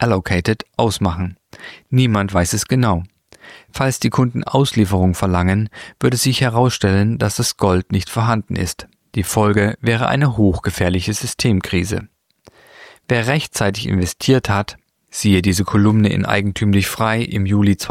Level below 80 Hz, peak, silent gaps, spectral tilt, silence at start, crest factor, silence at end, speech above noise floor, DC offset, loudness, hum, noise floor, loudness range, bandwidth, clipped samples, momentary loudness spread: -40 dBFS; -2 dBFS; none; -5.5 dB/octave; 0 s; 16 dB; 0 s; 34 dB; under 0.1%; -17 LUFS; none; -51 dBFS; 3 LU; 16 kHz; under 0.1%; 8 LU